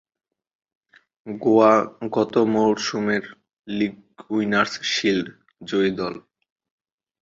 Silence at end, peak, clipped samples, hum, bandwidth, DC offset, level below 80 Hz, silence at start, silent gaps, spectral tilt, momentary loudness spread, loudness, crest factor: 1.05 s; -2 dBFS; under 0.1%; none; 7.8 kHz; under 0.1%; -62 dBFS; 1.25 s; 3.53-3.64 s; -5 dB/octave; 15 LU; -21 LUFS; 20 dB